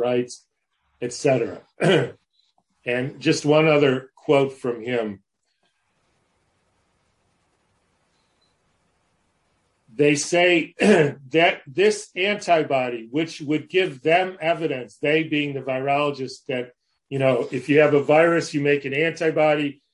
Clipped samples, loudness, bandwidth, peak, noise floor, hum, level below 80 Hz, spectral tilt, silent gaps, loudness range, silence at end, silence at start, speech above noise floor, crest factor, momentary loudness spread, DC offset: under 0.1%; -21 LUFS; 11.5 kHz; -4 dBFS; -71 dBFS; none; -68 dBFS; -5 dB/octave; none; 7 LU; 0.2 s; 0 s; 51 dB; 20 dB; 12 LU; under 0.1%